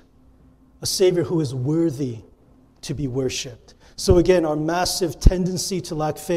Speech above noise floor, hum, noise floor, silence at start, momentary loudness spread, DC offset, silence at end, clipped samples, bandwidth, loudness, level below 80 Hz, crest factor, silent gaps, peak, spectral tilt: 33 dB; none; -53 dBFS; 0.8 s; 12 LU; under 0.1%; 0 s; under 0.1%; 16 kHz; -22 LUFS; -30 dBFS; 22 dB; none; 0 dBFS; -5 dB/octave